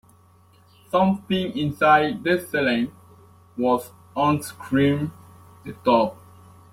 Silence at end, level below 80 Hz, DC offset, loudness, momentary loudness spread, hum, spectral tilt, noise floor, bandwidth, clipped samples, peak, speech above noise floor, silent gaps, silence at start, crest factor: 0.6 s; -58 dBFS; under 0.1%; -22 LUFS; 13 LU; none; -6 dB/octave; -55 dBFS; 16.5 kHz; under 0.1%; -4 dBFS; 33 dB; none; 0.95 s; 18 dB